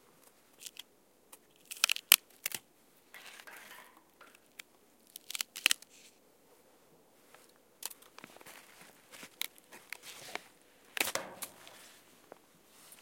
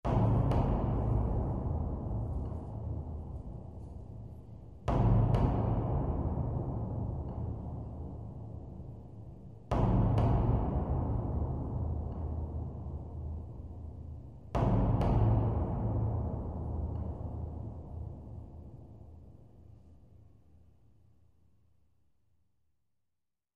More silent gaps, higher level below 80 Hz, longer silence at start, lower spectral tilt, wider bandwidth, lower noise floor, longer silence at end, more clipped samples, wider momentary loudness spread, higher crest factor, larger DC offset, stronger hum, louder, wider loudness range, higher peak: neither; second, -86 dBFS vs -40 dBFS; first, 0.6 s vs 0.05 s; second, 2 dB/octave vs -10.5 dB/octave; first, 17 kHz vs 4.8 kHz; second, -67 dBFS vs -88 dBFS; second, 1.15 s vs 3.4 s; neither; first, 25 LU vs 19 LU; first, 40 dB vs 18 dB; second, under 0.1% vs 0.1%; neither; about the same, -33 LUFS vs -34 LUFS; first, 15 LU vs 10 LU; first, 0 dBFS vs -16 dBFS